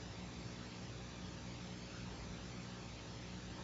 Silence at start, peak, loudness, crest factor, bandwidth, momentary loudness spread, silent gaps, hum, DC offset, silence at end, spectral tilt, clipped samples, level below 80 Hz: 0 s; -36 dBFS; -49 LUFS; 12 dB; 7.6 kHz; 1 LU; none; 60 Hz at -55 dBFS; under 0.1%; 0 s; -4.5 dB/octave; under 0.1%; -58 dBFS